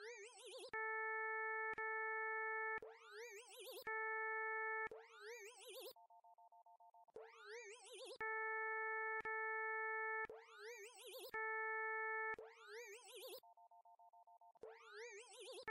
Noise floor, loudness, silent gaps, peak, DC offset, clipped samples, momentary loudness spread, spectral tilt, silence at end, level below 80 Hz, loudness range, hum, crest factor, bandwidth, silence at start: -68 dBFS; -47 LUFS; none; -36 dBFS; under 0.1%; under 0.1%; 14 LU; -0.5 dB/octave; 0 s; under -90 dBFS; 9 LU; none; 12 dB; 15.5 kHz; 0 s